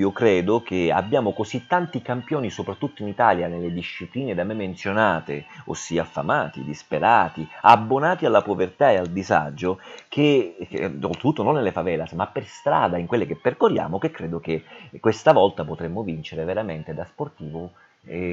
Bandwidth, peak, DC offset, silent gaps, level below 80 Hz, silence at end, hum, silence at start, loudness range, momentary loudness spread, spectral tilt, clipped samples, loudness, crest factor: 8 kHz; 0 dBFS; under 0.1%; none; -56 dBFS; 0 s; none; 0 s; 5 LU; 13 LU; -6 dB/octave; under 0.1%; -22 LUFS; 22 dB